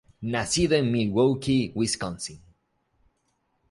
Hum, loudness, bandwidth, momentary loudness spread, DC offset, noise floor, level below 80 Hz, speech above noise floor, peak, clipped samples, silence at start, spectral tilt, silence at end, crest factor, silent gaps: none; -25 LUFS; 11.5 kHz; 10 LU; under 0.1%; -73 dBFS; -50 dBFS; 48 dB; -10 dBFS; under 0.1%; 0.2 s; -5 dB/octave; 1.35 s; 18 dB; none